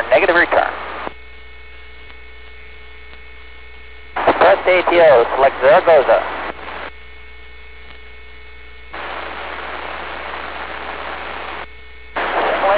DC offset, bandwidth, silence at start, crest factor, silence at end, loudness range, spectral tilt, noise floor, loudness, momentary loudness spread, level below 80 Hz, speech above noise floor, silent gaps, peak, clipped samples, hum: 1%; 4 kHz; 0 s; 12 dB; 0 s; 17 LU; -7.5 dB/octave; -39 dBFS; -16 LUFS; 27 LU; -42 dBFS; 27 dB; none; -6 dBFS; under 0.1%; none